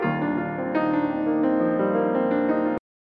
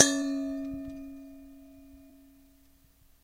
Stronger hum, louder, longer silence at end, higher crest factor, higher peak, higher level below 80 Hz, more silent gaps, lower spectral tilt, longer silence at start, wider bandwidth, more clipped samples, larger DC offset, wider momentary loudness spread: neither; first, -24 LUFS vs -31 LUFS; second, 0.35 s vs 1.15 s; second, 12 dB vs 34 dB; second, -10 dBFS vs 0 dBFS; about the same, -60 dBFS vs -58 dBFS; neither; first, -10 dB/octave vs -1 dB/octave; about the same, 0 s vs 0 s; second, 5 kHz vs 16 kHz; neither; neither; second, 4 LU vs 23 LU